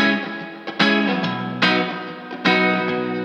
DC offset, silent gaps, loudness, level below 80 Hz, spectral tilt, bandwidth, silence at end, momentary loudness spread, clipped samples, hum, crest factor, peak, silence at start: under 0.1%; none; -19 LUFS; -68 dBFS; -5.5 dB/octave; 9.6 kHz; 0 s; 13 LU; under 0.1%; none; 18 dB; -2 dBFS; 0 s